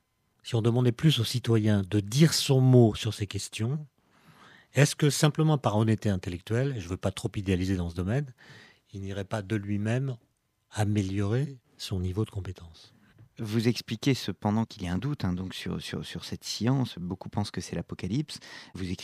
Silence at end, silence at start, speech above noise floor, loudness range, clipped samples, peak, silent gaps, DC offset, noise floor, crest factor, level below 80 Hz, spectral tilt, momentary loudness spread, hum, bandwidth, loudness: 0 s; 0.45 s; 31 dB; 8 LU; under 0.1%; -6 dBFS; none; under 0.1%; -58 dBFS; 22 dB; -56 dBFS; -6 dB/octave; 14 LU; none; 15 kHz; -28 LUFS